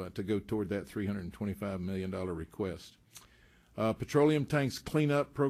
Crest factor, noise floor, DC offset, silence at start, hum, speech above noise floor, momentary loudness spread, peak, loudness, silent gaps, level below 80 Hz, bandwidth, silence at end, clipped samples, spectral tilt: 18 dB; -63 dBFS; under 0.1%; 0 s; none; 30 dB; 11 LU; -16 dBFS; -33 LUFS; none; -60 dBFS; 15 kHz; 0 s; under 0.1%; -7 dB/octave